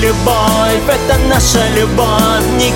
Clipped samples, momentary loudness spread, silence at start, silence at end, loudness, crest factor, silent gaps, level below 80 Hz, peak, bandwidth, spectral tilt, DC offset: under 0.1%; 2 LU; 0 s; 0 s; -11 LUFS; 10 dB; none; -20 dBFS; 0 dBFS; 17 kHz; -4 dB/octave; under 0.1%